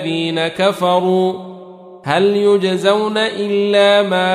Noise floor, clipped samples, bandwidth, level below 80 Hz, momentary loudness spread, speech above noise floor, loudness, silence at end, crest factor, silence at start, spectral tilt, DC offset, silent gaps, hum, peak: -36 dBFS; under 0.1%; 14 kHz; -62 dBFS; 7 LU; 22 dB; -15 LUFS; 0 s; 14 dB; 0 s; -5.5 dB/octave; under 0.1%; none; none; -2 dBFS